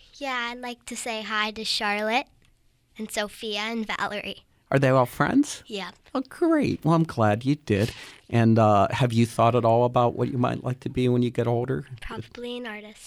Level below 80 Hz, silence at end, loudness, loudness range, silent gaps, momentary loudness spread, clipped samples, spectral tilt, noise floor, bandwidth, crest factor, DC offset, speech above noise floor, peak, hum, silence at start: -54 dBFS; 0 s; -24 LUFS; 6 LU; none; 14 LU; under 0.1%; -6 dB/octave; -62 dBFS; 15 kHz; 16 dB; under 0.1%; 38 dB; -8 dBFS; none; 0.15 s